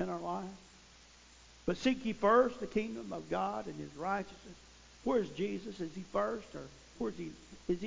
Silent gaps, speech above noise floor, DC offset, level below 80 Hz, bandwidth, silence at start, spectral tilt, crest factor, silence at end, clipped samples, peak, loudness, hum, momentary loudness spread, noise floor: none; 24 dB; under 0.1%; -62 dBFS; 7.6 kHz; 0 s; -6 dB/octave; 22 dB; 0 s; under 0.1%; -14 dBFS; -36 LUFS; none; 18 LU; -59 dBFS